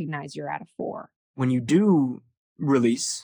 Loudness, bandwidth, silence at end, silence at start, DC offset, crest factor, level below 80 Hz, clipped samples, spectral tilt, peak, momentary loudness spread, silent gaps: -24 LUFS; over 20 kHz; 0 s; 0 s; under 0.1%; 16 dB; -72 dBFS; under 0.1%; -5.5 dB/octave; -8 dBFS; 16 LU; 1.16-1.34 s, 2.37-2.56 s